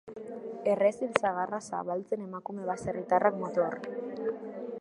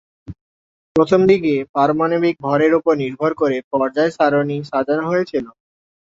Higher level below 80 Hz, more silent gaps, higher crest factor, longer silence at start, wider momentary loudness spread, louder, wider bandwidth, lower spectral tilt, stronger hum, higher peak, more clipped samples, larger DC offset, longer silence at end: second, -68 dBFS vs -54 dBFS; second, none vs 0.41-0.95 s, 1.69-1.74 s, 3.64-3.71 s; first, 28 dB vs 16 dB; second, 0.05 s vs 0.3 s; first, 13 LU vs 7 LU; second, -31 LUFS vs -17 LUFS; first, 11.5 kHz vs 7.8 kHz; second, -6 dB/octave vs -7.5 dB/octave; neither; about the same, -4 dBFS vs -2 dBFS; neither; neither; second, 0 s vs 0.65 s